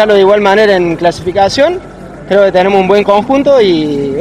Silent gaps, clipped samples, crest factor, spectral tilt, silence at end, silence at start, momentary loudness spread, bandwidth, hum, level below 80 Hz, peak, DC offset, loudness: none; 2%; 8 dB; -5.5 dB/octave; 0 s; 0 s; 6 LU; 11.5 kHz; none; -38 dBFS; 0 dBFS; under 0.1%; -9 LUFS